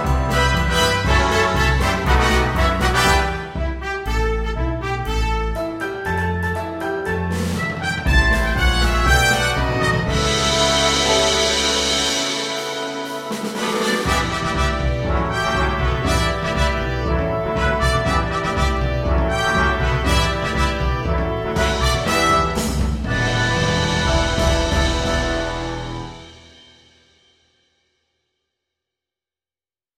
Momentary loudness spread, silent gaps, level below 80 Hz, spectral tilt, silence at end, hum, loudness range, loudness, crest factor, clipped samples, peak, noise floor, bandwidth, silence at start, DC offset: 8 LU; none; -24 dBFS; -4 dB/octave; 3.6 s; none; 6 LU; -19 LUFS; 18 dB; under 0.1%; -2 dBFS; under -90 dBFS; 16 kHz; 0 s; under 0.1%